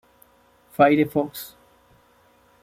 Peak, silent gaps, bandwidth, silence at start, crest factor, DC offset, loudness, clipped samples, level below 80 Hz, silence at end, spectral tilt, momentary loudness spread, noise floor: -4 dBFS; none; 16 kHz; 0.8 s; 22 dB; under 0.1%; -20 LUFS; under 0.1%; -64 dBFS; 1.15 s; -6.5 dB/octave; 20 LU; -58 dBFS